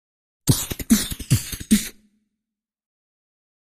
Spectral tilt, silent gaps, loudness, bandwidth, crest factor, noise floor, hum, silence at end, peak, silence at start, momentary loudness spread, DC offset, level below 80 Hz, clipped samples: -4 dB/octave; none; -22 LUFS; 15.5 kHz; 22 dB; -86 dBFS; none; 1.85 s; -4 dBFS; 0.45 s; 4 LU; under 0.1%; -40 dBFS; under 0.1%